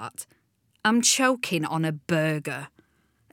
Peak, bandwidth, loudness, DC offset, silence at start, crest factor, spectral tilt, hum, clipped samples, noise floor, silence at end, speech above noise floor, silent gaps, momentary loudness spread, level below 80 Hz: -8 dBFS; 18 kHz; -24 LUFS; under 0.1%; 0 s; 20 dB; -3.5 dB/octave; none; under 0.1%; -66 dBFS; 0.65 s; 41 dB; none; 19 LU; -76 dBFS